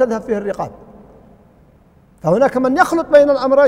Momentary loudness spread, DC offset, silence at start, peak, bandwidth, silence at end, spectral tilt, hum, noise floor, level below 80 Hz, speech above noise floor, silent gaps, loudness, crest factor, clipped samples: 12 LU; under 0.1%; 0 s; 0 dBFS; 14.5 kHz; 0 s; -6 dB/octave; none; -49 dBFS; -48 dBFS; 36 dB; none; -15 LUFS; 16 dB; under 0.1%